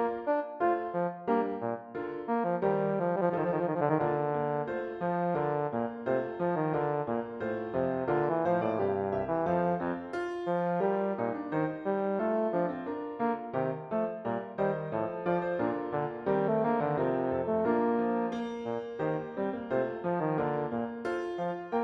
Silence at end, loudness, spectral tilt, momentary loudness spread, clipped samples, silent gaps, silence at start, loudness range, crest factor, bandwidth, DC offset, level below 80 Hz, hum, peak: 0 s; -31 LUFS; -9 dB/octave; 6 LU; under 0.1%; none; 0 s; 2 LU; 16 dB; 6.2 kHz; under 0.1%; -66 dBFS; none; -14 dBFS